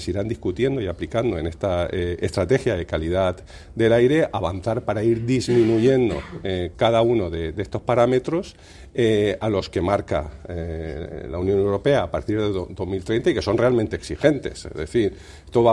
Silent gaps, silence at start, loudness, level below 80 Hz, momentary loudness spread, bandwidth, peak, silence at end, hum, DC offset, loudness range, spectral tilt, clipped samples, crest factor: none; 0 s; -22 LUFS; -44 dBFS; 11 LU; 12 kHz; -2 dBFS; 0 s; none; under 0.1%; 4 LU; -7 dB/octave; under 0.1%; 20 dB